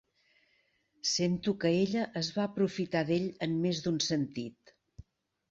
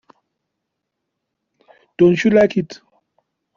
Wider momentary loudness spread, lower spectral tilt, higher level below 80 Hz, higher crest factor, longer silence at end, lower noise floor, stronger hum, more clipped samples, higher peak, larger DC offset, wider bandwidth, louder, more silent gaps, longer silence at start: second, 5 LU vs 12 LU; second, -5 dB/octave vs -6.5 dB/octave; second, -66 dBFS vs -58 dBFS; about the same, 18 dB vs 18 dB; second, 0.5 s vs 0.8 s; second, -73 dBFS vs -78 dBFS; neither; neither; second, -14 dBFS vs -2 dBFS; neither; about the same, 7.8 kHz vs 7.2 kHz; second, -32 LUFS vs -15 LUFS; neither; second, 1.05 s vs 2 s